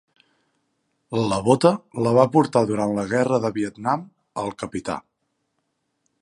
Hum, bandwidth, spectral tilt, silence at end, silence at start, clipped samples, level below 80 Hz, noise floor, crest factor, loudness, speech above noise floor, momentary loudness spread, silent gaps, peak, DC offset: none; 11.5 kHz; -6.5 dB/octave; 1.2 s; 1.1 s; under 0.1%; -58 dBFS; -74 dBFS; 22 dB; -22 LUFS; 53 dB; 13 LU; none; -2 dBFS; under 0.1%